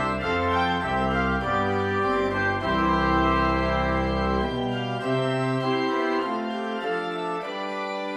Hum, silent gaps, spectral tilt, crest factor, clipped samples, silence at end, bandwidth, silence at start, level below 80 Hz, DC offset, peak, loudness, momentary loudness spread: none; none; -6.5 dB/octave; 14 dB; under 0.1%; 0 s; 11.5 kHz; 0 s; -38 dBFS; under 0.1%; -10 dBFS; -25 LUFS; 7 LU